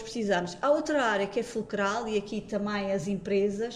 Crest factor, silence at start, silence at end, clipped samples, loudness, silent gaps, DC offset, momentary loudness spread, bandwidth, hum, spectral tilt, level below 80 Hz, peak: 16 dB; 0 s; 0 s; under 0.1%; -29 LUFS; none; under 0.1%; 6 LU; 11.5 kHz; none; -5 dB/octave; -58 dBFS; -12 dBFS